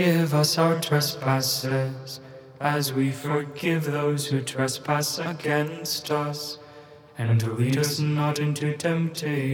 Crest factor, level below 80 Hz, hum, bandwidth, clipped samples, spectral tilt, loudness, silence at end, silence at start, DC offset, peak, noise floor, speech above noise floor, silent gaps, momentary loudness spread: 18 dB; -72 dBFS; none; 19.5 kHz; under 0.1%; -5 dB/octave; -25 LUFS; 0 s; 0 s; under 0.1%; -6 dBFS; -47 dBFS; 23 dB; none; 10 LU